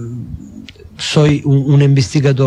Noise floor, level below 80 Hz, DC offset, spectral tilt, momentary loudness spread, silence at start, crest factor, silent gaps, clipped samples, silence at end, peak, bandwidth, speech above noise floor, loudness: -35 dBFS; -42 dBFS; under 0.1%; -6.5 dB/octave; 19 LU; 0 s; 12 dB; none; under 0.1%; 0 s; 0 dBFS; 9.8 kHz; 24 dB; -12 LUFS